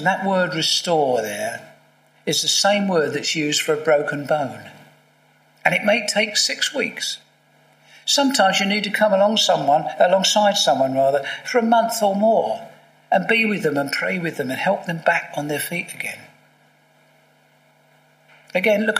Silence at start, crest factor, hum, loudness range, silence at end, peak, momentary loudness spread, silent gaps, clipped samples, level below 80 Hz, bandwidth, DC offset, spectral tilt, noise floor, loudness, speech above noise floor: 0 s; 20 dB; none; 8 LU; 0 s; 0 dBFS; 10 LU; none; under 0.1%; -74 dBFS; 15.5 kHz; under 0.1%; -3 dB/octave; -57 dBFS; -19 LUFS; 37 dB